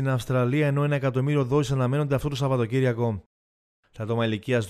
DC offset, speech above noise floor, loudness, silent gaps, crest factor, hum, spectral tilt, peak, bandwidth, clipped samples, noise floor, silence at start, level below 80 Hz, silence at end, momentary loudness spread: under 0.1%; over 66 dB; -25 LUFS; 3.26-3.83 s; 14 dB; none; -7.5 dB/octave; -10 dBFS; 14 kHz; under 0.1%; under -90 dBFS; 0 s; -52 dBFS; 0 s; 5 LU